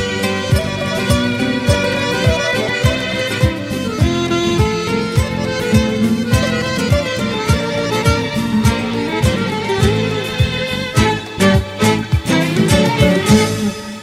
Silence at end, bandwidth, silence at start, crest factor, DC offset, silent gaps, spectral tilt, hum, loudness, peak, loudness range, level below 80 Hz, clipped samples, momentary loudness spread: 0 s; 16 kHz; 0 s; 16 dB; under 0.1%; none; -5.5 dB/octave; none; -16 LUFS; 0 dBFS; 2 LU; -28 dBFS; under 0.1%; 5 LU